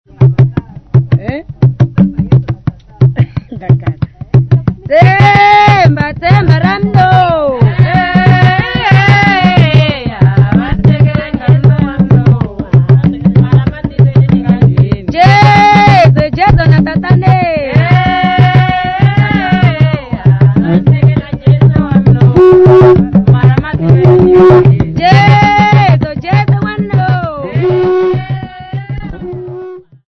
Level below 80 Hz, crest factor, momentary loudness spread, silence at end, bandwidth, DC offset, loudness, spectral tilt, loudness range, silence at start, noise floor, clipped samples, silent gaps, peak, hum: -28 dBFS; 8 dB; 10 LU; 0.3 s; 6.2 kHz; 0.2%; -8 LUFS; -8.5 dB/octave; 6 LU; 0.2 s; -27 dBFS; 5%; none; 0 dBFS; none